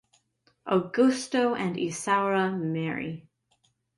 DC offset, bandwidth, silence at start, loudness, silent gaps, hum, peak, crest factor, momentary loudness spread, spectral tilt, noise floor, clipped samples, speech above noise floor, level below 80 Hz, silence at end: under 0.1%; 11.5 kHz; 0.65 s; -27 LUFS; none; none; -10 dBFS; 18 dB; 11 LU; -5.5 dB/octave; -71 dBFS; under 0.1%; 44 dB; -70 dBFS; 0.75 s